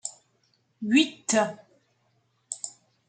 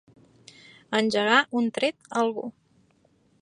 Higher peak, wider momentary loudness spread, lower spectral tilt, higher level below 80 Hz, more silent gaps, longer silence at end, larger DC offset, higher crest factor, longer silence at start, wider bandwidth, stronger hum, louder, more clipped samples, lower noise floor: about the same, -8 dBFS vs -6 dBFS; first, 17 LU vs 9 LU; second, -2.5 dB/octave vs -4 dB/octave; second, -80 dBFS vs -74 dBFS; neither; second, 0.4 s vs 0.9 s; neither; about the same, 22 dB vs 22 dB; second, 0.05 s vs 0.9 s; second, 9.4 kHz vs 11 kHz; neither; about the same, -26 LUFS vs -24 LUFS; neither; first, -70 dBFS vs -64 dBFS